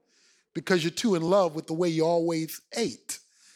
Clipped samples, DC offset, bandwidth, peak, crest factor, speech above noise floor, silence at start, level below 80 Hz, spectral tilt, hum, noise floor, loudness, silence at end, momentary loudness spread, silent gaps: under 0.1%; under 0.1%; 17.5 kHz; -8 dBFS; 18 dB; 39 dB; 0.55 s; -74 dBFS; -5 dB/octave; none; -65 dBFS; -27 LUFS; 0.4 s; 14 LU; none